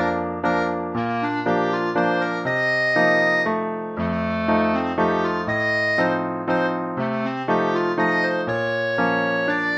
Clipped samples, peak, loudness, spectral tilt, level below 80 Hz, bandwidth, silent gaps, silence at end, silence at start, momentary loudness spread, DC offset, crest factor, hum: under 0.1%; -6 dBFS; -21 LUFS; -6.5 dB/octave; -54 dBFS; 8.6 kHz; none; 0 s; 0 s; 6 LU; under 0.1%; 16 dB; none